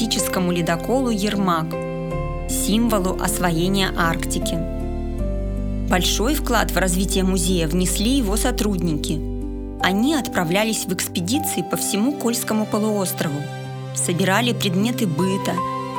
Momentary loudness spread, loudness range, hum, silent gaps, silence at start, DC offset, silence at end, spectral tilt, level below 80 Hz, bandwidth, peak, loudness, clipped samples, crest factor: 8 LU; 2 LU; none; none; 0 s; under 0.1%; 0 s; -4.5 dB/octave; -30 dBFS; over 20 kHz; -2 dBFS; -21 LUFS; under 0.1%; 18 dB